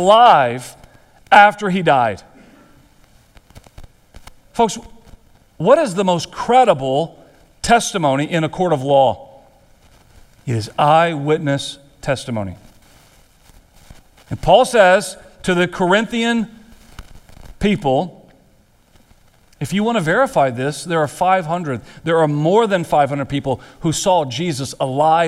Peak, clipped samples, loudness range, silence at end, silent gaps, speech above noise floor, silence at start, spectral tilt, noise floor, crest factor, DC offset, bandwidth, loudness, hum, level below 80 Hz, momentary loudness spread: 0 dBFS; under 0.1%; 7 LU; 0 s; none; 38 dB; 0 s; -5 dB/octave; -53 dBFS; 18 dB; under 0.1%; 15 kHz; -16 LUFS; none; -44 dBFS; 14 LU